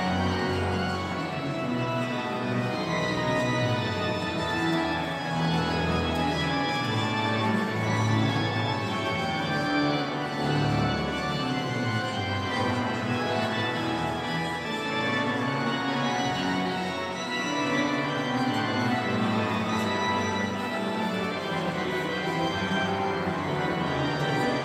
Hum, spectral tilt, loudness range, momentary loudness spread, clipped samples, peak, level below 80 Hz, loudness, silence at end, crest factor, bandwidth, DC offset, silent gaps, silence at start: none; -5.5 dB/octave; 2 LU; 3 LU; under 0.1%; -12 dBFS; -52 dBFS; -27 LUFS; 0 s; 14 dB; 15.5 kHz; under 0.1%; none; 0 s